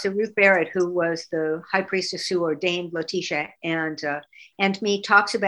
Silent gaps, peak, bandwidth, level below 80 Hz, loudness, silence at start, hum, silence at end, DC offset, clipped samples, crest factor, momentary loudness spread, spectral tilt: none; -2 dBFS; 11.5 kHz; -72 dBFS; -23 LUFS; 0 s; none; 0 s; under 0.1%; under 0.1%; 20 dB; 9 LU; -4 dB/octave